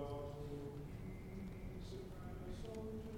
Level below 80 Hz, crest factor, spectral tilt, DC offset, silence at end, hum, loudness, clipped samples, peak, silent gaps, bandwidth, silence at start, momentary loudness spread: -56 dBFS; 16 dB; -7.5 dB/octave; under 0.1%; 0 s; none; -50 LUFS; under 0.1%; -32 dBFS; none; 19 kHz; 0 s; 3 LU